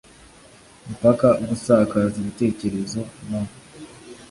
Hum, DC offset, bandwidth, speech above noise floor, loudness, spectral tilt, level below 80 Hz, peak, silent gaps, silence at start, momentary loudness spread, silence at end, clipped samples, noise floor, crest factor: none; under 0.1%; 11.5 kHz; 28 dB; -21 LUFS; -7 dB/octave; -50 dBFS; -4 dBFS; none; 0.85 s; 24 LU; 0.05 s; under 0.1%; -49 dBFS; 18 dB